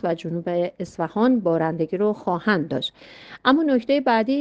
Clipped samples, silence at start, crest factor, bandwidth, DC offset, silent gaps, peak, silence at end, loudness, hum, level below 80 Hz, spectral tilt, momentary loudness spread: under 0.1%; 0.05 s; 18 dB; 8 kHz; under 0.1%; none; -4 dBFS; 0 s; -22 LUFS; none; -62 dBFS; -7 dB/octave; 8 LU